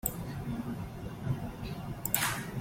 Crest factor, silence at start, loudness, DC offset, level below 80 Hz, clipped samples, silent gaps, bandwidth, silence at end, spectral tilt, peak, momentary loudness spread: 28 dB; 0.05 s; -35 LUFS; under 0.1%; -50 dBFS; under 0.1%; none; 16.5 kHz; 0 s; -4 dB/octave; -8 dBFS; 10 LU